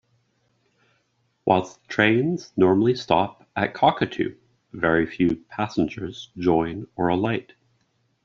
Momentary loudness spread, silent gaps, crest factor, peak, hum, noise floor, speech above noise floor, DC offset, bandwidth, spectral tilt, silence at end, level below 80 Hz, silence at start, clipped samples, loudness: 10 LU; none; 20 dB; -2 dBFS; none; -69 dBFS; 47 dB; under 0.1%; 7.4 kHz; -4.5 dB/octave; 0.85 s; -56 dBFS; 1.45 s; under 0.1%; -23 LUFS